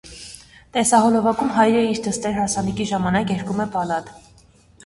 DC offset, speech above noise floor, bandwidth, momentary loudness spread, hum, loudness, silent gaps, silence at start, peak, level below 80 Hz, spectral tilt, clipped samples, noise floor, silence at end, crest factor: under 0.1%; 32 dB; 12 kHz; 11 LU; none; -20 LUFS; none; 0.05 s; -2 dBFS; -48 dBFS; -4.5 dB/octave; under 0.1%; -52 dBFS; 0.65 s; 18 dB